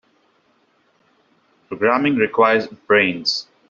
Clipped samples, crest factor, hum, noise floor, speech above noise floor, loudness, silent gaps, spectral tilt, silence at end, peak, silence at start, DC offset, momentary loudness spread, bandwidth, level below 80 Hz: under 0.1%; 18 dB; none; -61 dBFS; 44 dB; -17 LUFS; none; -2 dB/octave; 0.25 s; -2 dBFS; 1.7 s; under 0.1%; 6 LU; 7.6 kHz; -64 dBFS